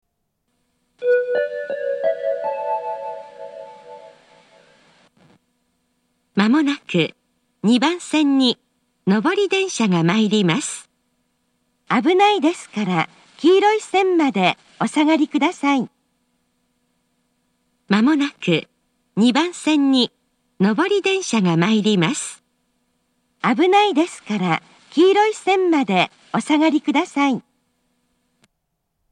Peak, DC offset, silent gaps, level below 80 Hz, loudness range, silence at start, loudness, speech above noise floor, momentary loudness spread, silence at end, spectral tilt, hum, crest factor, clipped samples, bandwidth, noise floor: 0 dBFS; under 0.1%; none; -76 dBFS; 6 LU; 1 s; -19 LUFS; 57 dB; 10 LU; 1.7 s; -5 dB/octave; none; 20 dB; under 0.1%; 11 kHz; -74 dBFS